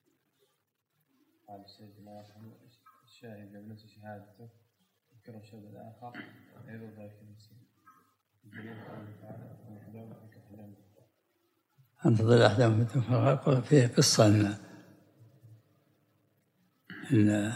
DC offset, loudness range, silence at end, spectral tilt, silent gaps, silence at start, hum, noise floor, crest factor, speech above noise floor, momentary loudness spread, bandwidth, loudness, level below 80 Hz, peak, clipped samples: under 0.1%; 26 LU; 0 s; -5.5 dB/octave; none; 1.5 s; none; -79 dBFS; 26 dB; 49 dB; 28 LU; 14 kHz; -25 LUFS; -76 dBFS; -6 dBFS; under 0.1%